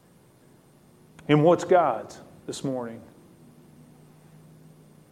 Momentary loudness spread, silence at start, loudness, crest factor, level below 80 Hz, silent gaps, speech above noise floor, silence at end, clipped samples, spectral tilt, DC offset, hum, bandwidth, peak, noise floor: 23 LU; 1.3 s; -23 LUFS; 22 dB; -68 dBFS; none; 34 dB; 2.1 s; under 0.1%; -6.5 dB/octave; under 0.1%; none; 14 kHz; -6 dBFS; -57 dBFS